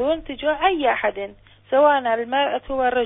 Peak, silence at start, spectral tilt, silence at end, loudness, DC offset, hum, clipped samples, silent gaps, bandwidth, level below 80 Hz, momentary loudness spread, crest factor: -6 dBFS; 0 s; -8.5 dB/octave; 0 s; -20 LUFS; under 0.1%; none; under 0.1%; none; 4 kHz; -48 dBFS; 8 LU; 16 dB